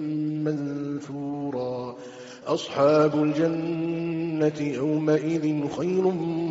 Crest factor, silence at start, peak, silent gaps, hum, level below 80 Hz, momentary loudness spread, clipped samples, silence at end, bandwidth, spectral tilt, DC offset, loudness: 14 dB; 0 s; -10 dBFS; none; none; -66 dBFS; 11 LU; under 0.1%; 0 s; 7.8 kHz; -6.5 dB/octave; under 0.1%; -26 LUFS